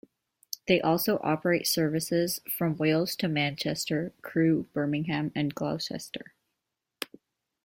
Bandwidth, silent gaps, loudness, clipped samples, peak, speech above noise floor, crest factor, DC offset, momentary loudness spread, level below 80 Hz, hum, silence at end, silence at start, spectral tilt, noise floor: 16.5 kHz; none; -28 LUFS; under 0.1%; -8 dBFS; 57 dB; 20 dB; under 0.1%; 14 LU; -66 dBFS; none; 0.6 s; 0.65 s; -5 dB/octave; -85 dBFS